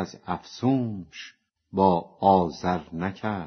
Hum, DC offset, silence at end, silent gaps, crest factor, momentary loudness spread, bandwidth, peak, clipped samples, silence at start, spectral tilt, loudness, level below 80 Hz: none; under 0.1%; 0 s; none; 20 dB; 17 LU; 6.6 kHz; -6 dBFS; under 0.1%; 0 s; -6.5 dB/octave; -25 LUFS; -58 dBFS